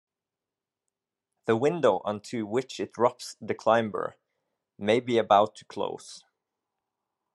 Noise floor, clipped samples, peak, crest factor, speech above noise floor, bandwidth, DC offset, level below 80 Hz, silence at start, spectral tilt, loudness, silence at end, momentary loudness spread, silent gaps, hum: -90 dBFS; under 0.1%; -6 dBFS; 22 dB; 63 dB; 12 kHz; under 0.1%; -76 dBFS; 1.45 s; -5.5 dB/octave; -27 LUFS; 1.15 s; 14 LU; none; none